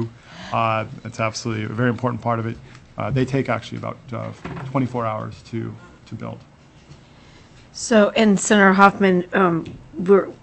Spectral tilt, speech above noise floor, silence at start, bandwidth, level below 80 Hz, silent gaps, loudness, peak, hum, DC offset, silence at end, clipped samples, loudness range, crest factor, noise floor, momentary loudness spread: -5.5 dB/octave; 27 dB; 0 s; 8.6 kHz; -52 dBFS; none; -20 LUFS; 0 dBFS; none; under 0.1%; 0.1 s; under 0.1%; 12 LU; 20 dB; -47 dBFS; 20 LU